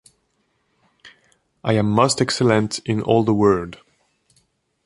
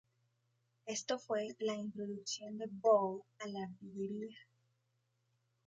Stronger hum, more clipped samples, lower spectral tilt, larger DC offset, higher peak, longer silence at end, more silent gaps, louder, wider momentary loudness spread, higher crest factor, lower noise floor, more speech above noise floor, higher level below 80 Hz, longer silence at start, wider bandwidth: neither; neither; first, -5.5 dB/octave vs -4 dB/octave; neither; first, -2 dBFS vs -18 dBFS; second, 1.1 s vs 1.25 s; neither; first, -19 LUFS vs -39 LUFS; second, 7 LU vs 15 LU; about the same, 20 dB vs 22 dB; second, -68 dBFS vs -81 dBFS; first, 50 dB vs 43 dB; first, -52 dBFS vs -84 dBFS; first, 1.05 s vs 0.85 s; first, 11.5 kHz vs 9.2 kHz